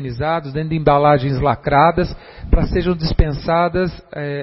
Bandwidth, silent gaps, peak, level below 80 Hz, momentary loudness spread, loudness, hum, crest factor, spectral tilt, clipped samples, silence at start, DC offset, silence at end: 5.8 kHz; none; 0 dBFS; -24 dBFS; 10 LU; -17 LUFS; none; 16 dB; -10.5 dB/octave; under 0.1%; 0 s; under 0.1%; 0 s